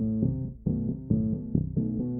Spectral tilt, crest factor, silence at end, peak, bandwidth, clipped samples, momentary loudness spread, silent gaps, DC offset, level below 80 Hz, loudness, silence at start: -16.5 dB/octave; 18 dB; 0 s; -12 dBFS; 1.4 kHz; under 0.1%; 3 LU; none; under 0.1%; -42 dBFS; -29 LUFS; 0 s